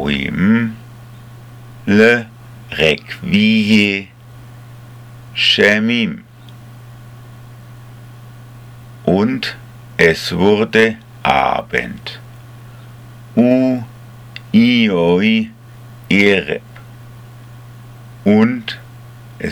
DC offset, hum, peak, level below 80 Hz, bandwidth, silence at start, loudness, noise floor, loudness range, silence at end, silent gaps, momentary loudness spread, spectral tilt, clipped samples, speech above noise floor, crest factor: under 0.1%; none; 0 dBFS; -46 dBFS; 15 kHz; 0 s; -14 LUFS; -37 dBFS; 5 LU; 0 s; none; 16 LU; -5.5 dB/octave; under 0.1%; 24 dB; 16 dB